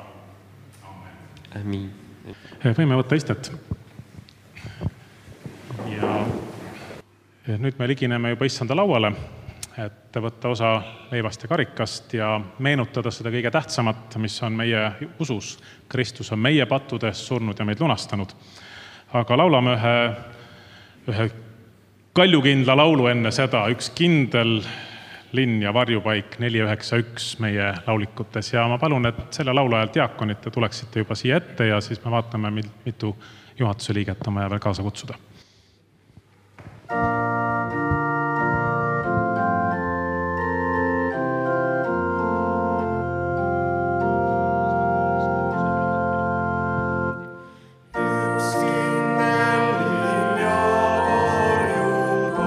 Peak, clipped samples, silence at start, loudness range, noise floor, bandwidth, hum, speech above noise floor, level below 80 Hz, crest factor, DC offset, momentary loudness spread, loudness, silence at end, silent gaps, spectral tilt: 0 dBFS; under 0.1%; 0 s; 8 LU; -57 dBFS; 13.5 kHz; none; 35 dB; -54 dBFS; 22 dB; under 0.1%; 16 LU; -22 LUFS; 0 s; none; -6 dB/octave